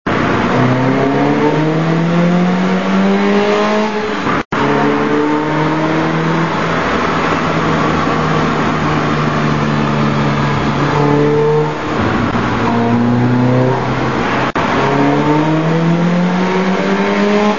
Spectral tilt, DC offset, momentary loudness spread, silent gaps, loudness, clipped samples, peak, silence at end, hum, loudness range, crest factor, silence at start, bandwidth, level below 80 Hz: -7 dB/octave; 3%; 3 LU; 4.45-4.51 s; -13 LUFS; under 0.1%; 0 dBFS; 0 s; none; 1 LU; 12 dB; 0.05 s; 7.4 kHz; -38 dBFS